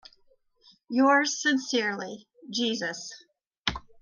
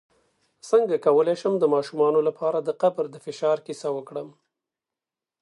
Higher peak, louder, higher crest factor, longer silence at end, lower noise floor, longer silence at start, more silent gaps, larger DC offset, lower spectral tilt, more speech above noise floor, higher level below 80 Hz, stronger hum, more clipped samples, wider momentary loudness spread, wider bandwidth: about the same, -8 dBFS vs -6 dBFS; second, -27 LUFS vs -23 LUFS; about the same, 22 dB vs 18 dB; second, 0.2 s vs 1.1 s; second, -65 dBFS vs -89 dBFS; first, 0.9 s vs 0.65 s; first, 3.58-3.64 s vs none; neither; second, -2.5 dB/octave vs -6 dB/octave; second, 38 dB vs 66 dB; first, -56 dBFS vs -80 dBFS; neither; neither; first, 18 LU vs 12 LU; second, 9.8 kHz vs 11 kHz